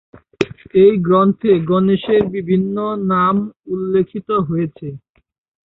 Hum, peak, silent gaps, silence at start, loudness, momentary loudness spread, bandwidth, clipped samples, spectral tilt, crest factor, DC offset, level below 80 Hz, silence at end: none; -2 dBFS; 3.59-3.63 s; 0.4 s; -16 LUFS; 11 LU; 7.2 kHz; under 0.1%; -9 dB/octave; 16 dB; under 0.1%; -50 dBFS; 0.7 s